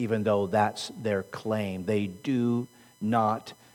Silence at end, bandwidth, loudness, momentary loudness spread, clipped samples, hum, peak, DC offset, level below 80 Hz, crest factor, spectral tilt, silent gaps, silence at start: 0.2 s; 19 kHz; -29 LUFS; 7 LU; under 0.1%; none; -12 dBFS; under 0.1%; -70 dBFS; 16 dB; -6.5 dB/octave; none; 0 s